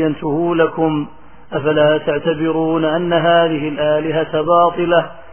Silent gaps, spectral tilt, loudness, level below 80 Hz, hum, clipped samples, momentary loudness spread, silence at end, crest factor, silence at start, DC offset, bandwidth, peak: none; -10 dB/octave; -16 LUFS; -52 dBFS; none; under 0.1%; 5 LU; 0.1 s; 16 dB; 0 s; 1%; 3.3 kHz; 0 dBFS